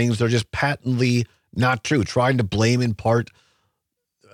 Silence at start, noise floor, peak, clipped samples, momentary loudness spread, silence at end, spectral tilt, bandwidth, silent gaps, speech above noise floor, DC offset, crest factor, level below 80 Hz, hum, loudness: 0 s; -79 dBFS; -6 dBFS; under 0.1%; 4 LU; 1.1 s; -6 dB/octave; 13.5 kHz; none; 59 dB; under 0.1%; 16 dB; -50 dBFS; none; -21 LUFS